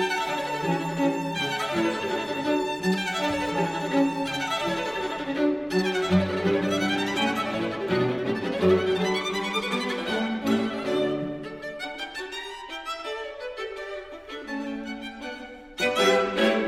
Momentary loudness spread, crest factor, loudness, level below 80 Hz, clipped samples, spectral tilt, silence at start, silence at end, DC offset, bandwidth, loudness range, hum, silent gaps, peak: 12 LU; 18 dB; -26 LUFS; -58 dBFS; under 0.1%; -5 dB/octave; 0 s; 0 s; under 0.1%; 16.5 kHz; 9 LU; none; none; -8 dBFS